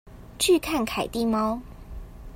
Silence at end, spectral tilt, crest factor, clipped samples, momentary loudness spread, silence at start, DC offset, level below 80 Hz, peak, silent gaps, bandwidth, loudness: 0 s; -3.5 dB/octave; 18 dB; under 0.1%; 22 LU; 0.05 s; under 0.1%; -44 dBFS; -8 dBFS; none; 16.5 kHz; -25 LUFS